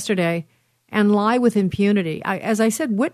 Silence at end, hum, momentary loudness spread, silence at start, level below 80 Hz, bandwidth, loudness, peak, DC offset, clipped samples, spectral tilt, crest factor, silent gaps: 0.05 s; none; 7 LU; 0 s; -56 dBFS; 13.5 kHz; -20 LUFS; -6 dBFS; under 0.1%; under 0.1%; -6 dB/octave; 14 dB; none